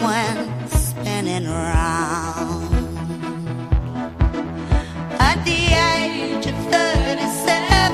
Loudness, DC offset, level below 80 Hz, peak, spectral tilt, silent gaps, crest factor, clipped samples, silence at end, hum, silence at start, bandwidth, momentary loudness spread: -20 LUFS; under 0.1%; -26 dBFS; 0 dBFS; -4.5 dB/octave; none; 18 dB; under 0.1%; 0 s; none; 0 s; 15 kHz; 11 LU